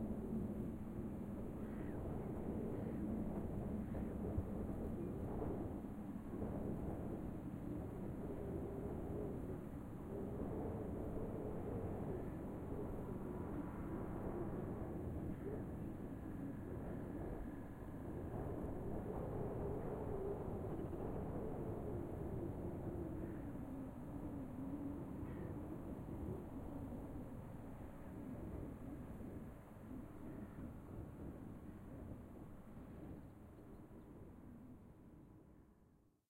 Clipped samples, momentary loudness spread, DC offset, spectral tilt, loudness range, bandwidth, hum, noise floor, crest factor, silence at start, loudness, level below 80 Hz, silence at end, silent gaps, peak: under 0.1%; 10 LU; under 0.1%; -9.5 dB/octave; 8 LU; 16 kHz; none; -72 dBFS; 16 dB; 0 s; -48 LUFS; -56 dBFS; 0.35 s; none; -30 dBFS